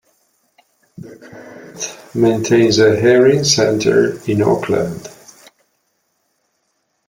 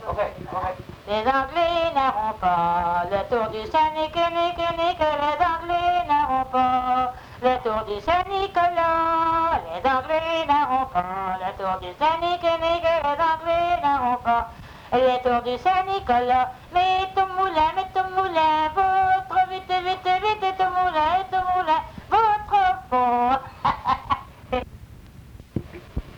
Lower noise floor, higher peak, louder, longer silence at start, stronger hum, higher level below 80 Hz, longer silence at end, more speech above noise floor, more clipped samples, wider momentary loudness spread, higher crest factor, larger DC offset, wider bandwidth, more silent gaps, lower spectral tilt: first, -67 dBFS vs -44 dBFS; first, 0 dBFS vs -8 dBFS; first, -14 LUFS vs -22 LUFS; first, 1 s vs 0 s; neither; second, -52 dBFS vs -46 dBFS; first, 2 s vs 0 s; first, 53 dB vs 22 dB; neither; first, 25 LU vs 8 LU; about the same, 16 dB vs 14 dB; neither; second, 16.5 kHz vs 19.5 kHz; neither; about the same, -4.5 dB/octave vs -5.5 dB/octave